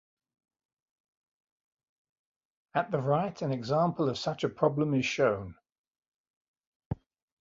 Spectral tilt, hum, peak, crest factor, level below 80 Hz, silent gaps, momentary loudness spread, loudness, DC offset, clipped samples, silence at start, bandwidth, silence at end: -6.5 dB/octave; none; -12 dBFS; 22 dB; -62 dBFS; 5.72-5.91 s, 6.08-6.24 s, 6.30-6.41 s, 6.48-6.54 s, 6.67-6.90 s; 14 LU; -30 LUFS; under 0.1%; under 0.1%; 2.75 s; 7.8 kHz; 0.45 s